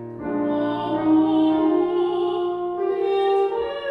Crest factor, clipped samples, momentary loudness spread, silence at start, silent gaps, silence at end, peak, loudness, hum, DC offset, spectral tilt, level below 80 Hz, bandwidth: 12 dB; under 0.1%; 7 LU; 0 s; none; 0 s; -10 dBFS; -21 LUFS; none; under 0.1%; -8 dB/octave; -58 dBFS; 5.2 kHz